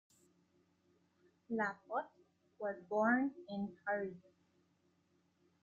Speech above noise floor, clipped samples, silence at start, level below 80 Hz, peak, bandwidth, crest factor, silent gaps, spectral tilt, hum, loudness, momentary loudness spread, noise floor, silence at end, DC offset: 38 dB; under 0.1%; 1.5 s; -84 dBFS; -22 dBFS; 8.2 kHz; 20 dB; none; -7.5 dB/octave; none; -39 LUFS; 11 LU; -77 dBFS; 1.45 s; under 0.1%